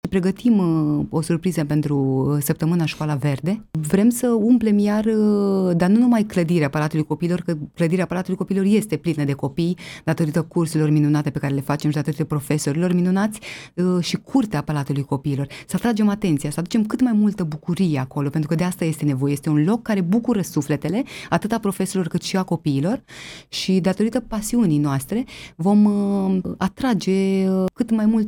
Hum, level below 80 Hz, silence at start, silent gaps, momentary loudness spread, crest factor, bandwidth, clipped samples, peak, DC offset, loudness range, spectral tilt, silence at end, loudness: none; -50 dBFS; 0.05 s; none; 7 LU; 16 dB; 18 kHz; under 0.1%; -4 dBFS; under 0.1%; 4 LU; -7 dB/octave; 0 s; -21 LUFS